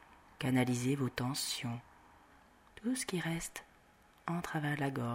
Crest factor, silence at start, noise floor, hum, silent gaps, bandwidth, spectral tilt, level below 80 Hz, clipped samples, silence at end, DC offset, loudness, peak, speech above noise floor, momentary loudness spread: 20 dB; 0.1 s; -65 dBFS; none; none; 16 kHz; -4.5 dB/octave; -66 dBFS; under 0.1%; 0 s; under 0.1%; -37 LUFS; -18 dBFS; 29 dB; 11 LU